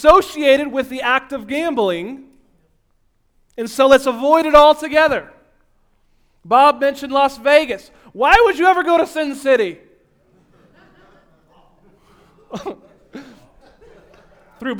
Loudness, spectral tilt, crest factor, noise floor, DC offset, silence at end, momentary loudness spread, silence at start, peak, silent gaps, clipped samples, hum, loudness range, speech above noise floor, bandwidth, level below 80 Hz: -15 LUFS; -3.5 dB/octave; 18 dB; -61 dBFS; under 0.1%; 0 s; 18 LU; 0 s; 0 dBFS; none; under 0.1%; none; 8 LU; 46 dB; 18.5 kHz; -42 dBFS